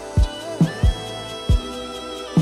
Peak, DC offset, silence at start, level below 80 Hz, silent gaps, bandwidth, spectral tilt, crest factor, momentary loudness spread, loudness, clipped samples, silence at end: -6 dBFS; under 0.1%; 0 s; -24 dBFS; none; 13.5 kHz; -6.5 dB/octave; 14 dB; 11 LU; -23 LUFS; under 0.1%; 0 s